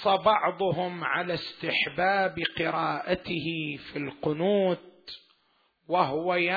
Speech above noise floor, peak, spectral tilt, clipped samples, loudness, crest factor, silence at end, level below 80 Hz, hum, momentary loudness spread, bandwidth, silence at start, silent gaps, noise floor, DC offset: 42 dB; -8 dBFS; -7.5 dB/octave; under 0.1%; -28 LUFS; 20 dB; 0 s; -62 dBFS; none; 10 LU; 4.9 kHz; 0 s; none; -69 dBFS; under 0.1%